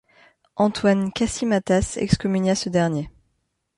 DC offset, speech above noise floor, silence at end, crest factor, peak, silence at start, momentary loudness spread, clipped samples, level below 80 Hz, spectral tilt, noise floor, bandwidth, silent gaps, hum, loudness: under 0.1%; 52 dB; 0.7 s; 20 dB; -4 dBFS; 0.55 s; 5 LU; under 0.1%; -42 dBFS; -5.5 dB/octave; -72 dBFS; 11.5 kHz; none; none; -22 LUFS